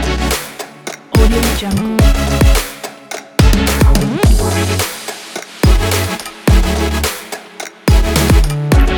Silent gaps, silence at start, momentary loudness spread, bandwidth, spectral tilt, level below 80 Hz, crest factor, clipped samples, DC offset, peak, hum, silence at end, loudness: none; 0 s; 14 LU; 19.5 kHz; -5 dB/octave; -16 dBFS; 12 dB; under 0.1%; under 0.1%; 0 dBFS; none; 0 s; -14 LUFS